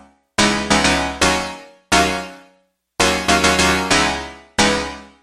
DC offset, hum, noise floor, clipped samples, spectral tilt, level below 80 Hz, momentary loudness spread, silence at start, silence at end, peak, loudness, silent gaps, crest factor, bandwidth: under 0.1%; none; -60 dBFS; under 0.1%; -2.5 dB/octave; -36 dBFS; 14 LU; 0.4 s; 0.15 s; 0 dBFS; -16 LUFS; none; 18 dB; 15.5 kHz